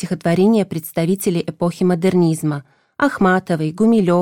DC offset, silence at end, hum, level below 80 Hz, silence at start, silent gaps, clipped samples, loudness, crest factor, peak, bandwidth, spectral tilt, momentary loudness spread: under 0.1%; 0 s; none; -54 dBFS; 0 s; none; under 0.1%; -17 LUFS; 12 dB; -4 dBFS; 17.5 kHz; -7 dB/octave; 7 LU